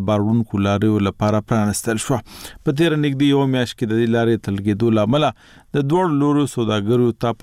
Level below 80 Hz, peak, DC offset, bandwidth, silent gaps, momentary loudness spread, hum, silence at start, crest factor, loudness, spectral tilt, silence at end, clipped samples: -48 dBFS; -6 dBFS; under 0.1%; 16 kHz; none; 6 LU; none; 0 s; 12 dB; -19 LUFS; -6.5 dB/octave; 0.1 s; under 0.1%